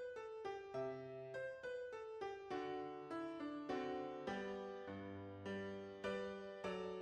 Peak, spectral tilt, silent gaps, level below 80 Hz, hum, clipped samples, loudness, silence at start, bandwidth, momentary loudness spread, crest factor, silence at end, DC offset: -32 dBFS; -6 dB/octave; none; -78 dBFS; none; under 0.1%; -48 LUFS; 0 s; 9.8 kHz; 5 LU; 16 dB; 0 s; under 0.1%